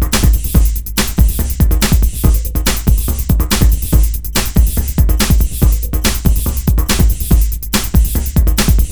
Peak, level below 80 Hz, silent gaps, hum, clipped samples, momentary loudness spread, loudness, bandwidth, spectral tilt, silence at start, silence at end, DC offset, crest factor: 0 dBFS; -12 dBFS; none; none; under 0.1%; 3 LU; -14 LUFS; over 20 kHz; -4.5 dB/octave; 0 s; 0 s; under 0.1%; 12 dB